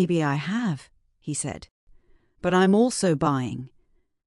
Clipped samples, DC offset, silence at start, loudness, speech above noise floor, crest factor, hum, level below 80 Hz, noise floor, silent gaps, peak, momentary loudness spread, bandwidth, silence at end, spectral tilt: under 0.1%; under 0.1%; 0 s; -24 LUFS; 40 dB; 16 dB; none; -58 dBFS; -63 dBFS; 1.71-1.87 s; -8 dBFS; 18 LU; 11.5 kHz; 0.6 s; -5.5 dB/octave